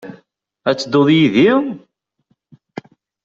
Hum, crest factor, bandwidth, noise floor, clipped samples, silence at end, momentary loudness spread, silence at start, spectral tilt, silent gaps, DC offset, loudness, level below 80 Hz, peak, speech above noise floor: none; 14 dB; 7.6 kHz; -65 dBFS; under 0.1%; 1.45 s; 23 LU; 0.05 s; -6.5 dB/octave; none; under 0.1%; -14 LUFS; -58 dBFS; -2 dBFS; 52 dB